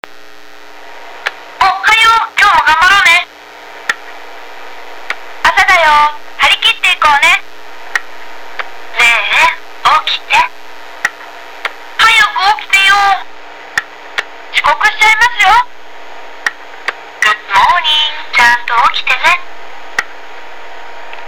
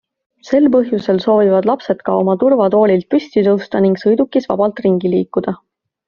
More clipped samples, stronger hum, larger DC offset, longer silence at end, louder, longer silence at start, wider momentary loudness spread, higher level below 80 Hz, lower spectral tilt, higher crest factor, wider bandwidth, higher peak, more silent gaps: neither; neither; first, 4% vs under 0.1%; second, 0 s vs 0.55 s; first, -9 LUFS vs -14 LUFS; second, 0 s vs 0.45 s; first, 23 LU vs 6 LU; first, -44 dBFS vs -56 dBFS; second, 0.5 dB/octave vs -6.5 dB/octave; about the same, 12 dB vs 14 dB; first, over 20 kHz vs 7 kHz; about the same, -2 dBFS vs 0 dBFS; neither